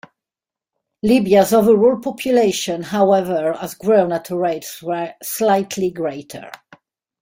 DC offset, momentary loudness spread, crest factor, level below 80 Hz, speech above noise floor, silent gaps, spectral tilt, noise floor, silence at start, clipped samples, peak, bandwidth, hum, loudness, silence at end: under 0.1%; 12 LU; 18 dB; -56 dBFS; 72 dB; none; -5 dB/octave; -89 dBFS; 1.05 s; under 0.1%; 0 dBFS; 16.5 kHz; none; -17 LUFS; 0.65 s